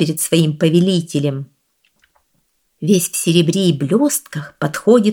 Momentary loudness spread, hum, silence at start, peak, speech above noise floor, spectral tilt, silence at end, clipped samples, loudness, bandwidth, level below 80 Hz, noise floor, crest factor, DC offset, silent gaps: 10 LU; none; 0 s; 0 dBFS; 49 dB; -5 dB/octave; 0 s; under 0.1%; -16 LUFS; 18.5 kHz; -60 dBFS; -65 dBFS; 16 dB; under 0.1%; none